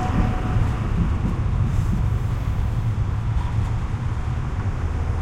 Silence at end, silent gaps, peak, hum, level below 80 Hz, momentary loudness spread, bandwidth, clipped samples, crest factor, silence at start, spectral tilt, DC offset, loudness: 0 s; none; -8 dBFS; none; -26 dBFS; 4 LU; 9.8 kHz; under 0.1%; 14 dB; 0 s; -8 dB/octave; under 0.1%; -24 LUFS